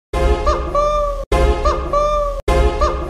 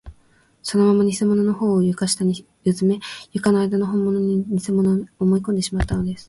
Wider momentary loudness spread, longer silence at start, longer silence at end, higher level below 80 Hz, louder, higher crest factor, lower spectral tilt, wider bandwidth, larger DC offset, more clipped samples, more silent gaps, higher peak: second, 3 LU vs 6 LU; about the same, 0.15 s vs 0.05 s; about the same, 0 s vs 0.05 s; first, -20 dBFS vs -40 dBFS; first, -17 LUFS vs -20 LUFS; about the same, 14 dB vs 14 dB; about the same, -6 dB/octave vs -6 dB/octave; about the same, 12 kHz vs 11.5 kHz; neither; neither; first, 1.26-1.31 s, 2.42-2.47 s vs none; first, -2 dBFS vs -6 dBFS